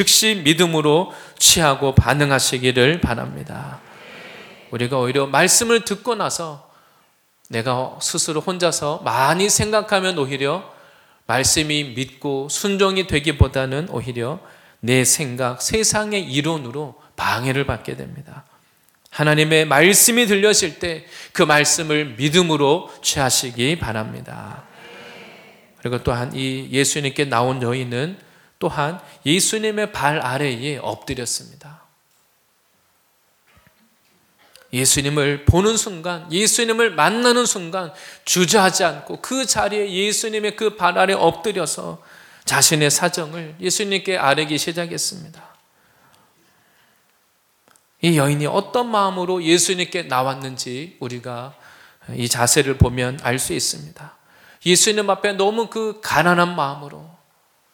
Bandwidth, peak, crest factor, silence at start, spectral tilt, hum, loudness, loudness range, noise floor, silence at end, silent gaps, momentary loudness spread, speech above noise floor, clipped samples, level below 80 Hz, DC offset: 19.5 kHz; 0 dBFS; 20 dB; 0 s; -3 dB/octave; none; -18 LUFS; 8 LU; -62 dBFS; 0.65 s; none; 16 LU; 43 dB; under 0.1%; -42 dBFS; under 0.1%